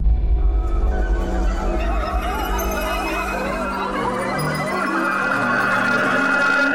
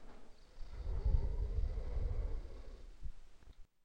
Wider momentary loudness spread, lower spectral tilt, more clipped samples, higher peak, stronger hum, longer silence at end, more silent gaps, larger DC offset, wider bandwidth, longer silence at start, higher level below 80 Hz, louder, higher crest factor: second, 6 LU vs 25 LU; second, -5.5 dB/octave vs -8 dB/octave; neither; first, -8 dBFS vs -20 dBFS; neither; second, 0 s vs 0.2 s; neither; neither; first, 16 kHz vs 6.4 kHz; about the same, 0 s vs 0 s; first, -24 dBFS vs -40 dBFS; first, -21 LUFS vs -43 LUFS; second, 12 dB vs 18 dB